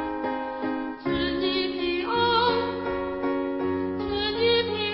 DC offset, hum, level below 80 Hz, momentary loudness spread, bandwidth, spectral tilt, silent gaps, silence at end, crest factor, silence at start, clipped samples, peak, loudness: under 0.1%; none; -50 dBFS; 8 LU; 5.8 kHz; -9.5 dB/octave; none; 0 s; 16 dB; 0 s; under 0.1%; -10 dBFS; -26 LUFS